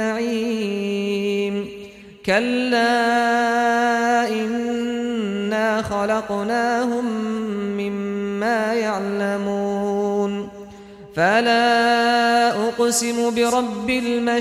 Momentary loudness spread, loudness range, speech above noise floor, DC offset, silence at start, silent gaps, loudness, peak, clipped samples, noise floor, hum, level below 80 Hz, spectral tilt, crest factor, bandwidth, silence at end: 8 LU; 4 LU; 21 dB; under 0.1%; 0 s; none; -20 LUFS; -6 dBFS; under 0.1%; -40 dBFS; none; -56 dBFS; -4 dB/octave; 16 dB; 15.5 kHz; 0 s